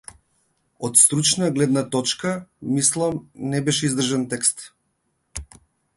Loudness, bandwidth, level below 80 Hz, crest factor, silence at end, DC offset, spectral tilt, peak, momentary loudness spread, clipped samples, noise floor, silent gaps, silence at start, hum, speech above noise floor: -20 LUFS; 12 kHz; -52 dBFS; 22 dB; 0.5 s; under 0.1%; -3.5 dB/octave; 0 dBFS; 19 LU; under 0.1%; -71 dBFS; none; 0.8 s; none; 50 dB